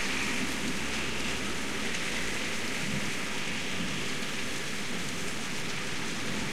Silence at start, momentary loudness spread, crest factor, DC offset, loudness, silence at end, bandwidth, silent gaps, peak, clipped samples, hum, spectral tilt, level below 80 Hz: 0 s; 3 LU; 14 dB; 2%; -32 LUFS; 0 s; 16 kHz; none; -18 dBFS; under 0.1%; none; -2.5 dB/octave; -52 dBFS